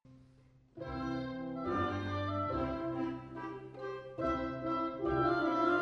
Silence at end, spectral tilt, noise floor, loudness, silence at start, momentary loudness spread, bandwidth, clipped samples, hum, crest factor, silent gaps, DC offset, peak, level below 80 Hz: 0 s; -8 dB/octave; -64 dBFS; -36 LUFS; 0.05 s; 13 LU; 6.6 kHz; under 0.1%; none; 18 dB; none; under 0.1%; -20 dBFS; -56 dBFS